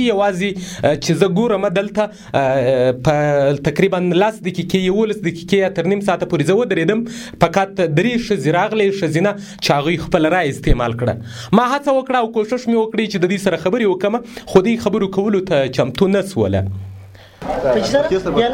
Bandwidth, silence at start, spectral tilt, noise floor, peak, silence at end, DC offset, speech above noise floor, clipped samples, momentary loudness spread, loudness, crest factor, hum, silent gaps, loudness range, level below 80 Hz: 16.5 kHz; 0 s; -6 dB/octave; -38 dBFS; 0 dBFS; 0 s; under 0.1%; 22 dB; under 0.1%; 6 LU; -17 LUFS; 16 dB; none; none; 1 LU; -34 dBFS